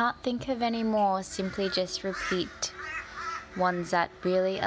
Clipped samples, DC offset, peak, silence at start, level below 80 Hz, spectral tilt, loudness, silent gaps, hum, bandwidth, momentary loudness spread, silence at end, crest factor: under 0.1%; under 0.1%; -12 dBFS; 0 s; -56 dBFS; -4 dB/octave; -30 LUFS; none; none; 8 kHz; 9 LU; 0 s; 18 dB